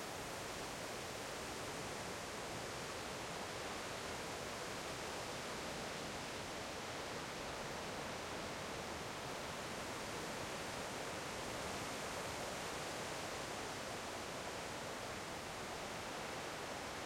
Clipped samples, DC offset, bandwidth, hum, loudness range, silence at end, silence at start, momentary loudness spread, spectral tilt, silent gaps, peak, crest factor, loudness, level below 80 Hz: under 0.1%; under 0.1%; 16.5 kHz; none; 1 LU; 0 s; 0 s; 2 LU; -3 dB/octave; none; -32 dBFS; 14 dB; -45 LUFS; -66 dBFS